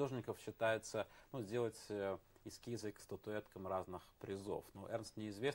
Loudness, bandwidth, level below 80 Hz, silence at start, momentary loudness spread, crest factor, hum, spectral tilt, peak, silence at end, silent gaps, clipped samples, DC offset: -46 LUFS; 16 kHz; -72 dBFS; 0 s; 10 LU; 20 dB; none; -5 dB/octave; -24 dBFS; 0 s; none; under 0.1%; under 0.1%